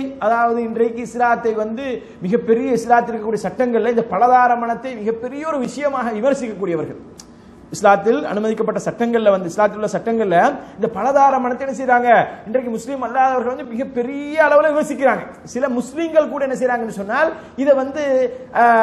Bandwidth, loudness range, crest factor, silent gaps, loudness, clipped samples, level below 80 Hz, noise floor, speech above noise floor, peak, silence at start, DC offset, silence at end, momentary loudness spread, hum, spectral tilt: 12.5 kHz; 3 LU; 18 dB; none; -18 LUFS; under 0.1%; -56 dBFS; -42 dBFS; 25 dB; 0 dBFS; 0 s; under 0.1%; 0 s; 10 LU; none; -5.5 dB/octave